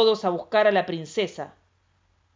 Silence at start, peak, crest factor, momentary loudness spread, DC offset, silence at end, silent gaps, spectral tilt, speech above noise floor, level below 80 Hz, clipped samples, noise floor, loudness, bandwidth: 0 s; -8 dBFS; 18 dB; 15 LU; under 0.1%; 0.85 s; none; -5 dB/octave; 43 dB; -68 dBFS; under 0.1%; -66 dBFS; -24 LUFS; 7.6 kHz